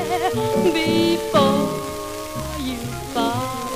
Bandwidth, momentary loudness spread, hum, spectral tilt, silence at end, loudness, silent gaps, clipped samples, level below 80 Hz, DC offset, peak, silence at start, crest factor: 16 kHz; 11 LU; none; -5 dB/octave; 0 s; -21 LUFS; none; under 0.1%; -42 dBFS; 0.2%; -4 dBFS; 0 s; 16 dB